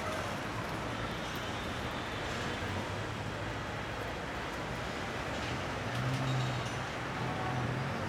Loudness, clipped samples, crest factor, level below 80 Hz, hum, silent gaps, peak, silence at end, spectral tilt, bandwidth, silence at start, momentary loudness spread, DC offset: -37 LUFS; under 0.1%; 14 dB; -52 dBFS; none; none; -22 dBFS; 0 s; -5 dB/octave; 17 kHz; 0 s; 4 LU; under 0.1%